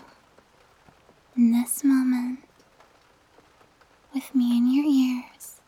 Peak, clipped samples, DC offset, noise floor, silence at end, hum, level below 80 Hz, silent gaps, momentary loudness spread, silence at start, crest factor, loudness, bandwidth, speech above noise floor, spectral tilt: -12 dBFS; under 0.1%; under 0.1%; -59 dBFS; 0.15 s; none; -72 dBFS; none; 14 LU; 1.35 s; 14 dB; -23 LUFS; 16.5 kHz; 38 dB; -4 dB/octave